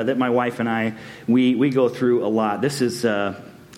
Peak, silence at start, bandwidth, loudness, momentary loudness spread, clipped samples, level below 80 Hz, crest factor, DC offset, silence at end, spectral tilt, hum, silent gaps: -6 dBFS; 0 s; 15.5 kHz; -21 LUFS; 8 LU; under 0.1%; -64 dBFS; 14 dB; under 0.1%; 0 s; -6 dB/octave; none; none